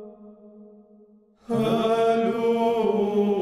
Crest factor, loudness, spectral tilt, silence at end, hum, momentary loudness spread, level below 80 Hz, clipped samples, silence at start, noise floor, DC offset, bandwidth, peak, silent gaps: 14 dB; -23 LUFS; -7 dB/octave; 0 s; none; 3 LU; -64 dBFS; under 0.1%; 0 s; -55 dBFS; under 0.1%; 14 kHz; -10 dBFS; none